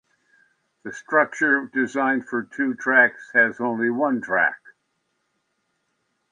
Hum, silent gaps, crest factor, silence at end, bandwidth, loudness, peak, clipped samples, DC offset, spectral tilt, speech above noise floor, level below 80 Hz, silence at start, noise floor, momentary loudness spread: none; none; 20 dB; 1.75 s; 9.6 kHz; -21 LUFS; -4 dBFS; under 0.1%; under 0.1%; -5.5 dB/octave; 52 dB; -74 dBFS; 0.85 s; -73 dBFS; 12 LU